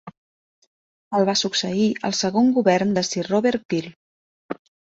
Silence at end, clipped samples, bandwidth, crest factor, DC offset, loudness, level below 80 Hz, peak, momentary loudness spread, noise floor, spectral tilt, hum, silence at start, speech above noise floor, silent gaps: 0.35 s; under 0.1%; 8 kHz; 18 dB; under 0.1%; -21 LUFS; -62 dBFS; -4 dBFS; 15 LU; under -90 dBFS; -4.5 dB/octave; none; 0.05 s; over 70 dB; 0.17-1.11 s, 3.65-3.69 s, 3.96-4.49 s